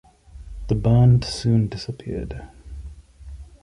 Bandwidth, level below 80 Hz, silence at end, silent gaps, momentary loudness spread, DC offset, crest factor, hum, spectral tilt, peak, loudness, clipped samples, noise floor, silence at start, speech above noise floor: 11 kHz; -36 dBFS; 0.2 s; none; 26 LU; under 0.1%; 16 dB; none; -7.5 dB/octave; -6 dBFS; -21 LUFS; under 0.1%; -41 dBFS; 0.35 s; 21 dB